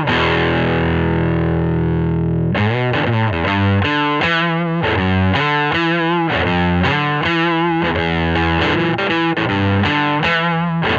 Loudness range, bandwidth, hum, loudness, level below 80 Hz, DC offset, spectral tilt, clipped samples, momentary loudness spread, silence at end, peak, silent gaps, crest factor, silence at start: 1 LU; 7.4 kHz; none; -16 LUFS; -34 dBFS; under 0.1%; -7.5 dB/octave; under 0.1%; 2 LU; 0 s; -2 dBFS; none; 12 dB; 0 s